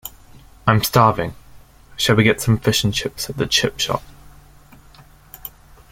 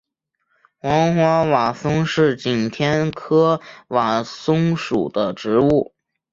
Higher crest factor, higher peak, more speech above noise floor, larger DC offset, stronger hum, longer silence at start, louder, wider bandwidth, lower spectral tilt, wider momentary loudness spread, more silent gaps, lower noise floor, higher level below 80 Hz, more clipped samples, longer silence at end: about the same, 20 dB vs 16 dB; about the same, 0 dBFS vs -2 dBFS; second, 29 dB vs 54 dB; neither; neither; second, 0.05 s vs 0.85 s; about the same, -18 LUFS vs -19 LUFS; first, 16.5 kHz vs 7.6 kHz; second, -4.5 dB/octave vs -6.5 dB/octave; first, 21 LU vs 6 LU; neither; second, -46 dBFS vs -72 dBFS; first, -44 dBFS vs -50 dBFS; neither; about the same, 0.45 s vs 0.5 s